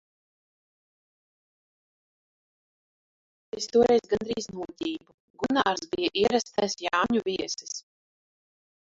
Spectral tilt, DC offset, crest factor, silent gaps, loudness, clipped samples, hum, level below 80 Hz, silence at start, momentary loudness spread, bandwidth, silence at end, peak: -3.5 dB/octave; under 0.1%; 22 dB; 5.14-5.34 s; -27 LUFS; under 0.1%; none; -62 dBFS; 3.55 s; 14 LU; 7.8 kHz; 1 s; -8 dBFS